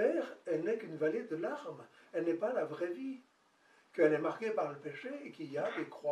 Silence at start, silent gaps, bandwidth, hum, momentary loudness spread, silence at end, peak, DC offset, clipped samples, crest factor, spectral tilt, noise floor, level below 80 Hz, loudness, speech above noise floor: 0 s; none; 10 kHz; none; 13 LU; 0 s; -16 dBFS; under 0.1%; under 0.1%; 22 dB; -6.5 dB/octave; -69 dBFS; under -90 dBFS; -37 LUFS; 32 dB